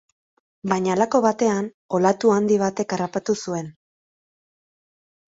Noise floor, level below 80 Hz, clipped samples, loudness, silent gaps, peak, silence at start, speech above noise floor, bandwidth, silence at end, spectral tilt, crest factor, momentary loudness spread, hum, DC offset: under -90 dBFS; -64 dBFS; under 0.1%; -21 LUFS; 1.74-1.89 s; -2 dBFS; 0.65 s; over 69 dB; 8 kHz; 1.6 s; -5.5 dB/octave; 22 dB; 10 LU; none; under 0.1%